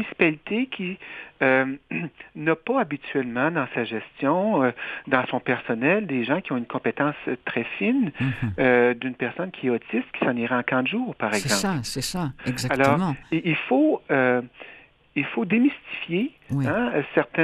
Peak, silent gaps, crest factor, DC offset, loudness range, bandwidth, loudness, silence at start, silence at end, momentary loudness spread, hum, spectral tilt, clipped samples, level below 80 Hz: -2 dBFS; none; 22 dB; under 0.1%; 2 LU; 13.5 kHz; -24 LUFS; 0 s; 0 s; 8 LU; none; -5.5 dB/octave; under 0.1%; -56 dBFS